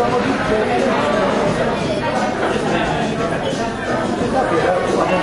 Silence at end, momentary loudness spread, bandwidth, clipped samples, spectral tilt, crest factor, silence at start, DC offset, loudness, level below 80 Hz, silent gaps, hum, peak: 0 s; 4 LU; 11.5 kHz; under 0.1%; -5.5 dB/octave; 14 dB; 0 s; under 0.1%; -18 LUFS; -40 dBFS; none; none; -2 dBFS